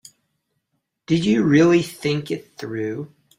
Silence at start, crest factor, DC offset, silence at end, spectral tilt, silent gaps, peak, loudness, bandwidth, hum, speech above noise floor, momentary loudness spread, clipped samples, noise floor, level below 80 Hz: 1.1 s; 16 dB; under 0.1%; 0.3 s; -6.5 dB/octave; none; -4 dBFS; -20 LUFS; 15.5 kHz; none; 55 dB; 15 LU; under 0.1%; -75 dBFS; -58 dBFS